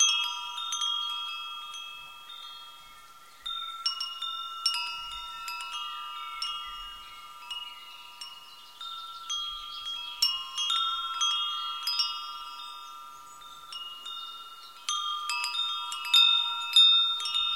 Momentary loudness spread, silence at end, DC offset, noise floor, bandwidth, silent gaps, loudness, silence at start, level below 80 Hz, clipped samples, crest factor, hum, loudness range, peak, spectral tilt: 21 LU; 0 s; 0.1%; -52 dBFS; 16.5 kHz; none; -27 LUFS; 0 s; -66 dBFS; under 0.1%; 22 dB; none; 12 LU; -10 dBFS; 4.5 dB/octave